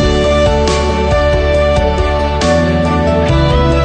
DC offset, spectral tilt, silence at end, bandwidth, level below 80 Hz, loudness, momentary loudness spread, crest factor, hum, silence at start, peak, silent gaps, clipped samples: under 0.1%; -6 dB/octave; 0 s; 9.4 kHz; -18 dBFS; -12 LUFS; 2 LU; 10 dB; none; 0 s; 0 dBFS; none; under 0.1%